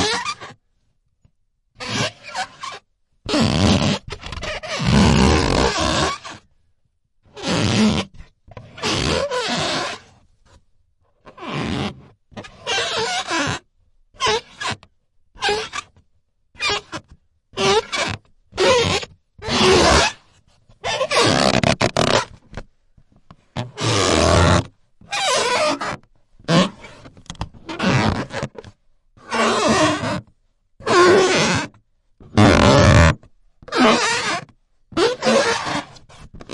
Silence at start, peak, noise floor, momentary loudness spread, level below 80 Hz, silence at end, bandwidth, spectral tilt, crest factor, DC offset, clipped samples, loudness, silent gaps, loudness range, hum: 0 s; -2 dBFS; -65 dBFS; 19 LU; -36 dBFS; 0 s; 11.5 kHz; -4.5 dB/octave; 18 dB; under 0.1%; under 0.1%; -18 LUFS; none; 9 LU; none